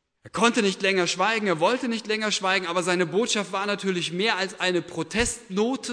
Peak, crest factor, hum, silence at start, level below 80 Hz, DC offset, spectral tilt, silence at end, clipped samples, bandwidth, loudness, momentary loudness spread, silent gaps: -6 dBFS; 20 dB; none; 0.25 s; -52 dBFS; under 0.1%; -3.5 dB/octave; 0 s; under 0.1%; 11 kHz; -24 LUFS; 4 LU; none